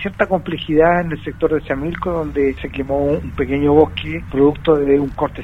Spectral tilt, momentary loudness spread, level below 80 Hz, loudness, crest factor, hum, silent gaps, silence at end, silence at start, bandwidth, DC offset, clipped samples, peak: -8.5 dB/octave; 8 LU; -34 dBFS; -17 LUFS; 16 dB; none; none; 0 s; 0 s; 6 kHz; under 0.1%; under 0.1%; 0 dBFS